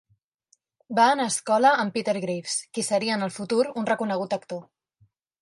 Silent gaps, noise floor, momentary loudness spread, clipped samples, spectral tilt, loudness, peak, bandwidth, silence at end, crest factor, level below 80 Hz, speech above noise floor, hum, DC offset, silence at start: none; -68 dBFS; 9 LU; under 0.1%; -3.5 dB/octave; -24 LUFS; -6 dBFS; 11.5 kHz; 0.8 s; 20 dB; -76 dBFS; 44 dB; none; under 0.1%; 0.9 s